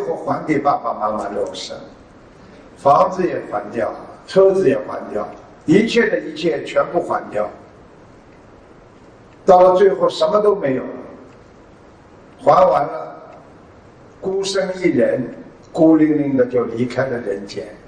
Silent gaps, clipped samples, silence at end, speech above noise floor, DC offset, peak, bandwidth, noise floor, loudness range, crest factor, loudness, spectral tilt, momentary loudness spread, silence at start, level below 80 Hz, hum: none; under 0.1%; 0.1 s; 28 dB; under 0.1%; 0 dBFS; 10 kHz; -44 dBFS; 4 LU; 18 dB; -17 LUFS; -6 dB/octave; 16 LU; 0 s; -52 dBFS; none